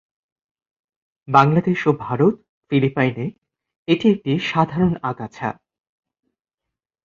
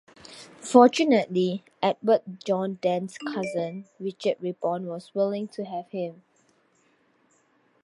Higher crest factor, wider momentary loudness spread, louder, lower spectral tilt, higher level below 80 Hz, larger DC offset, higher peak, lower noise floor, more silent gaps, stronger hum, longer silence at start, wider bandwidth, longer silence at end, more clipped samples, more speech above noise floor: about the same, 20 dB vs 24 dB; second, 13 LU vs 17 LU; first, -19 LUFS vs -26 LUFS; first, -8 dB/octave vs -5.5 dB/octave; first, -56 dBFS vs -78 dBFS; neither; about the same, -2 dBFS vs -2 dBFS; first, -85 dBFS vs -65 dBFS; first, 2.49-2.62 s, 3.76-3.86 s vs none; neither; first, 1.3 s vs 0.3 s; second, 7.4 kHz vs 11.5 kHz; second, 1.5 s vs 1.7 s; neither; first, 66 dB vs 40 dB